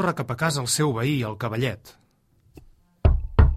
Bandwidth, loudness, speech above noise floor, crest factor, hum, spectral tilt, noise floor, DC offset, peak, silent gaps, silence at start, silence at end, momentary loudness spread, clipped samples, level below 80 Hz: 15 kHz; -24 LUFS; 37 dB; 20 dB; none; -5 dB/octave; -62 dBFS; under 0.1%; -4 dBFS; none; 0 s; 0 s; 6 LU; under 0.1%; -28 dBFS